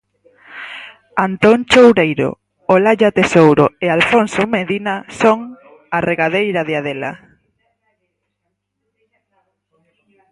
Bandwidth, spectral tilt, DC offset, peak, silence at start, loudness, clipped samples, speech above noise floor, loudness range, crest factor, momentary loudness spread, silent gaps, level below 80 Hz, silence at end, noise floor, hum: 11.5 kHz; -5.5 dB/octave; under 0.1%; 0 dBFS; 0.5 s; -14 LUFS; under 0.1%; 60 dB; 11 LU; 16 dB; 17 LU; none; -52 dBFS; 3.15 s; -73 dBFS; 50 Hz at -45 dBFS